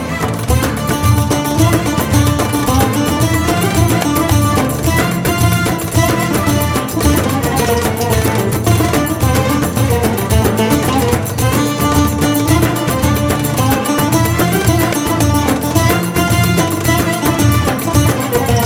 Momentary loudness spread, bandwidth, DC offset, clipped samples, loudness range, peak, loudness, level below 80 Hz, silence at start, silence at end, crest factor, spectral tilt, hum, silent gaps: 2 LU; 17.5 kHz; under 0.1%; under 0.1%; 1 LU; 0 dBFS; -13 LUFS; -28 dBFS; 0 s; 0 s; 12 dB; -5 dB/octave; none; none